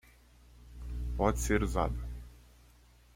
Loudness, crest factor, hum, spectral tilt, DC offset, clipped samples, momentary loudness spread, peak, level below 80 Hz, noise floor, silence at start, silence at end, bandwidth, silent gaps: -33 LUFS; 22 dB; 60 Hz at -40 dBFS; -6 dB/octave; under 0.1%; under 0.1%; 20 LU; -12 dBFS; -40 dBFS; -60 dBFS; 0.55 s; 0.75 s; 16.5 kHz; none